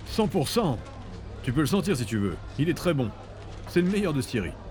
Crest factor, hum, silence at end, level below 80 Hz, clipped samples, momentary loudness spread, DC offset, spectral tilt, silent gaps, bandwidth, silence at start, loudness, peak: 16 dB; none; 0 s; -44 dBFS; under 0.1%; 16 LU; under 0.1%; -6 dB/octave; none; over 20 kHz; 0 s; -27 LUFS; -10 dBFS